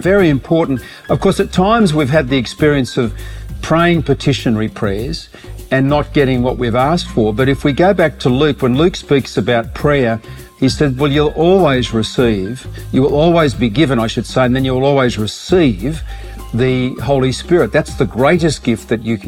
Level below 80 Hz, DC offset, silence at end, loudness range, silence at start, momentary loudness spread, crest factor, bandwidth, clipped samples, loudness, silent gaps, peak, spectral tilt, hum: -30 dBFS; under 0.1%; 0 s; 2 LU; 0 s; 9 LU; 12 dB; 16.5 kHz; under 0.1%; -14 LUFS; none; 0 dBFS; -6.5 dB/octave; none